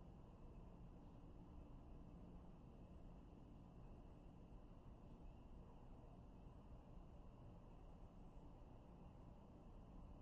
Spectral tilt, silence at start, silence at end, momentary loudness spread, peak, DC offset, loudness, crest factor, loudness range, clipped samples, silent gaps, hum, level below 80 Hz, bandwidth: -8.5 dB/octave; 0 s; 0 s; 2 LU; -48 dBFS; under 0.1%; -64 LUFS; 12 dB; 1 LU; under 0.1%; none; none; -64 dBFS; 6.6 kHz